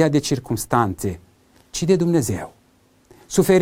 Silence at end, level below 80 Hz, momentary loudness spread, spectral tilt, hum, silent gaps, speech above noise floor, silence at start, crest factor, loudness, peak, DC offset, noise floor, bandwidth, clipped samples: 0 s; -46 dBFS; 13 LU; -5.5 dB/octave; none; none; 39 dB; 0 s; 20 dB; -21 LUFS; -2 dBFS; under 0.1%; -57 dBFS; 16.5 kHz; under 0.1%